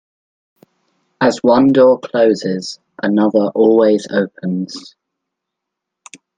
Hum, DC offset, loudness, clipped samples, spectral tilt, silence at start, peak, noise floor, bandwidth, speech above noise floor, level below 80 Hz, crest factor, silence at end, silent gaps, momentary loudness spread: none; under 0.1%; -14 LUFS; under 0.1%; -6.5 dB/octave; 1.2 s; 0 dBFS; -79 dBFS; 9.4 kHz; 66 dB; -60 dBFS; 16 dB; 1.6 s; none; 12 LU